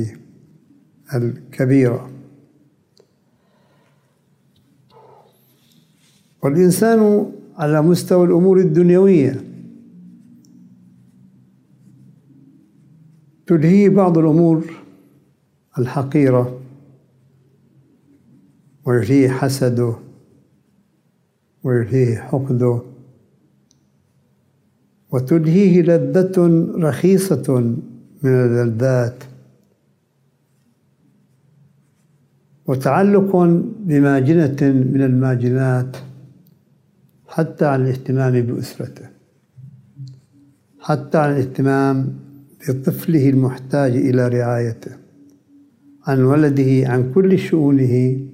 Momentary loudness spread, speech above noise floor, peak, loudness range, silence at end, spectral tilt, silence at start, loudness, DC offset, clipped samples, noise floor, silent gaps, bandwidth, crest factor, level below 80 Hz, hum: 15 LU; 48 dB; -2 dBFS; 8 LU; 0.05 s; -8 dB/octave; 0 s; -16 LUFS; under 0.1%; under 0.1%; -62 dBFS; none; 16 kHz; 16 dB; -62 dBFS; none